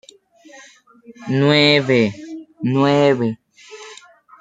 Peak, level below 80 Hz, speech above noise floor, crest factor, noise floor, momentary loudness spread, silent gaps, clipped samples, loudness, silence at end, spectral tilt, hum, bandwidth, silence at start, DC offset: -2 dBFS; -60 dBFS; 32 dB; 18 dB; -47 dBFS; 24 LU; none; under 0.1%; -16 LUFS; 0.45 s; -6 dB/octave; none; 9.2 kHz; 1.1 s; under 0.1%